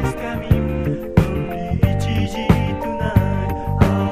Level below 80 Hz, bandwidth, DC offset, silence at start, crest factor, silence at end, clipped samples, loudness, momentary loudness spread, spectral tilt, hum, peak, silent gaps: -28 dBFS; 15.5 kHz; under 0.1%; 0 s; 18 dB; 0 s; under 0.1%; -20 LUFS; 5 LU; -7.5 dB/octave; none; 0 dBFS; none